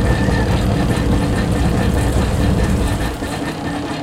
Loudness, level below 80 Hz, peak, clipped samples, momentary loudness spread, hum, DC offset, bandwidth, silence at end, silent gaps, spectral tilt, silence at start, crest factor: -18 LUFS; -22 dBFS; -2 dBFS; under 0.1%; 6 LU; none; under 0.1%; 16 kHz; 0 s; none; -6.5 dB/octave; 0 s; 14 dB